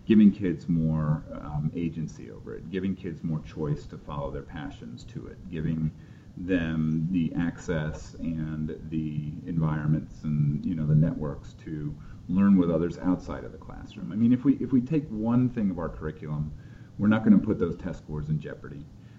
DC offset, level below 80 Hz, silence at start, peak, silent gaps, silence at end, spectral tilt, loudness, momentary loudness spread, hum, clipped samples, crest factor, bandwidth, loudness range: under 0.1%; -46 dBFS; 0.05 s; -8 dBFS; none; 0 s; -9 dB/octave; -28 LUFS; 18 LU; none; under 0.1%; 20 dB; 7.6 kHz; 8 LU